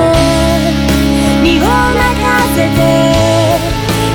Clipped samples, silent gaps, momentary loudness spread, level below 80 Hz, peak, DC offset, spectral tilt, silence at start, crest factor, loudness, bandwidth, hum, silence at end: under 0.1%; none; 3 LU; -20 dBFS; 0 dBFS; under 0.1%; -5 dB/octave; 0 s; 10 dB; -10 LUFS; over 20 kHz; none; 0 s